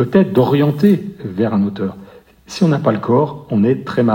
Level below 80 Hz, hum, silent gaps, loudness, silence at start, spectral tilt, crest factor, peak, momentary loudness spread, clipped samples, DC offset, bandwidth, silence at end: -54 dBFS; none; none; -16 LUFS; 0 s; -8 dB/octave; 14 dB; 0 dBFS; 10 LU; under 0.1%; under 0.1%; 16.5 kHz; 0 s